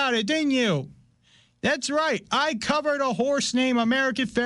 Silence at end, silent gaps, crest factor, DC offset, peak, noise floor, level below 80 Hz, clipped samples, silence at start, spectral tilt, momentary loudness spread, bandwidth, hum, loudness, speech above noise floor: 0 s; none; 12 dB; under 0.1%; -12 dBFS; -60 dBFS; -60 dBFS; under 0.1%; 0 s; -4 dB/octave; 4 LU; 11.5 kHz; none; -24 LUFS; 37 dB